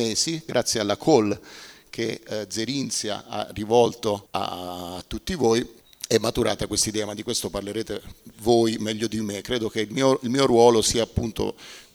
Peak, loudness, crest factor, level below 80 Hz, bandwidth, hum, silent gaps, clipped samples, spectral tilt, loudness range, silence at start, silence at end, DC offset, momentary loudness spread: -4 dBFS; -24 LUFS; 20 dB; -48 dBFS; 18.5 kHz; none; none; under 0.1%; -4 dB/octave; 4 LU; 0 s; 0.1 s; under 0.1%; 13 LU